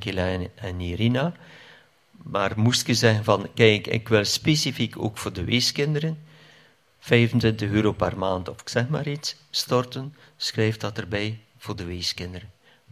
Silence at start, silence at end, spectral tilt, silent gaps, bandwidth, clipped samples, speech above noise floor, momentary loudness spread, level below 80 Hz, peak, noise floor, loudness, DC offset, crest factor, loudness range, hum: 0 s; 0.45 s; -5 dB/octave; none; 15 kHz; under 0.1%; 33 dB; 13 LU; -46 dBFS; -4 dBFS; -57 dBFS; -24 LUFS; under 0.1%; 22 dB; 6 LU; none